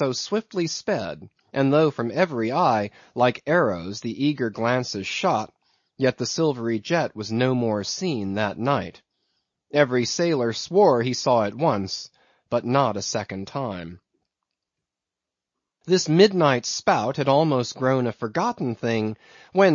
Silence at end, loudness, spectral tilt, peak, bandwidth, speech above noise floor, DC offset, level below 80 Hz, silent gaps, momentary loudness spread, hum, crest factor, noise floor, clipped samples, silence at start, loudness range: 0 s; -23 LUFS; -5 dB/octave; -4 dBFS; 7.6 kHz; 65 dB; under 0.1%; -66 dBFS; none; 11 LU; none; 20 dB; -87 dBFS; under 0.1%; 0 s; 5 LU